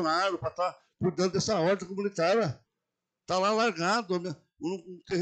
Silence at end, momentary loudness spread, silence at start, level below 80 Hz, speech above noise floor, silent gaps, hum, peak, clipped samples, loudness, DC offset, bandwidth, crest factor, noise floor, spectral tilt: 0 s; 10 LU; 0 s; -66 dBFS; 58 dB; none; none; -16 dBFS; under 0.1%; -29 LUFS; under 0.1%; 9.2 kHz; 14 dB; -87 dBFS; -5 dB/octave